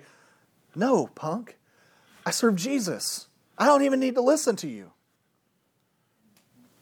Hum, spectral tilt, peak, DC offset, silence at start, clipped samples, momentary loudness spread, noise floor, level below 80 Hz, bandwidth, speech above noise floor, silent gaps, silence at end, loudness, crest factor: none; -4 dB/octave; -8 dBFS; under 0.1%; 0.75 s; under 0.1%; 15 LU; -71 dBFS; -86 dBFS; 19 kHz; 47 dB; none; 1.95 s; -25 LUFS; 20 dB